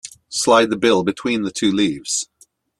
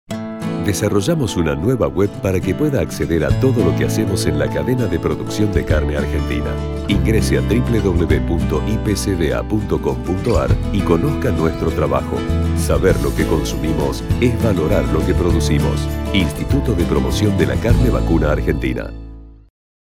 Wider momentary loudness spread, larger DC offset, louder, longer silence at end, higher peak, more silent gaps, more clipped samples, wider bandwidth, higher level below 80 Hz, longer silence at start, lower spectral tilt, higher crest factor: first, 8 LU vs 5 LU; neither; about the same, -18 LUFS vs -18 LUFS; about the same, 0.55 s vs 0.65 s; about the same, -2 dBFS vs 0 dBFS; neither; neither; second, 13 kHz vs 16.5 kHz; second, -58 dBFS vs -24 dBFS; about the same, 0.05 s vs 0.1 s; second, -3.5 dB/octave vs -6.5 dB/octave; about the same, 18 dB vs 16 dB